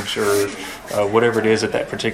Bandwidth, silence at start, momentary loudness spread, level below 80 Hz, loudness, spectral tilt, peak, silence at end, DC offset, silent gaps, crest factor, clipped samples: 16 kHz; 0 s; 8 LU; -52 dBFS; -19 LUFS; -4 dB/octave; -4 dBFS; 0 s; under 0.1%; none; 16 dB; under 0.1%